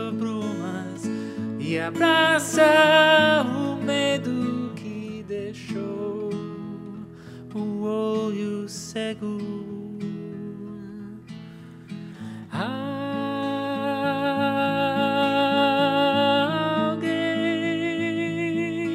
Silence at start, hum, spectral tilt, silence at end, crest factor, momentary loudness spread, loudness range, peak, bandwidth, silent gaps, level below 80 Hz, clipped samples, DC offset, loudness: 0 s; none; -4.5 dB/octave; 0 s; 20 dB; 19 LU; 14 LU; -4 dBFS; 16 kHz; none; -66 dBFS; under 0.1%; under 0.1%; -23 LUFS